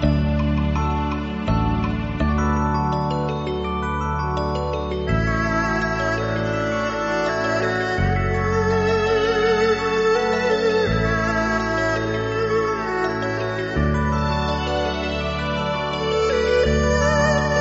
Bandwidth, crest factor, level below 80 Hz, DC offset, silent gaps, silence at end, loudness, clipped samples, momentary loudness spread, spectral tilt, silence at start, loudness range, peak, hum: 7.8 kHz; 16 dB; -30 dBFS; under 0.1%; none; 0 s; -21 LUFS; under 0.1%; 5 LU; -5 dB/octave; 0 s; 3 LU; -6 dBFS; none